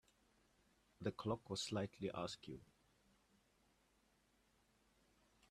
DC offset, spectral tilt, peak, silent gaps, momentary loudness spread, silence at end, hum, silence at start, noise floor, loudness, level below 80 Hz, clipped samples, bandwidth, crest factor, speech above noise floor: under 0.1%; -5 dB/octave; -28 dBFS; none; 10 LU; 2.85 s; none; 1 s; -78 dBFS; -46 LUFS; -76 dBFS; under 0.1%; 13.5 kHz; 22 dB; 32 dB